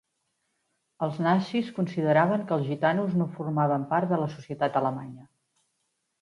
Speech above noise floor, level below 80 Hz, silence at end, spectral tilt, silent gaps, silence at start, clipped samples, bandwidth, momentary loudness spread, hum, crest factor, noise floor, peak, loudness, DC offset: 51 dB; -72 dBFS; 1 s; -8.5 dB/octave; none; 1 s; under 0.1%; 10.5 kHz; 9 LU; none; 18 dB; -77 dBFS; -10 dBFS; -27 LUFS; under 0.1%